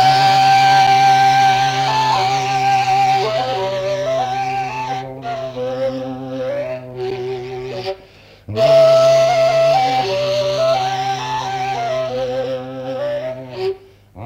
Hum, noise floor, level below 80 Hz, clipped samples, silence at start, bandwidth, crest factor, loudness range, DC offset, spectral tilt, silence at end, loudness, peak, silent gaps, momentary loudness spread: none; -44 dBFS; -50 dBFS; under 0.1%; 0 s; 16 kHz; 14 dB; 10 LU; under 0.1%; -4 dB/octave; 0 s; -16 LUFS; -2 dBFS; none; 15 LU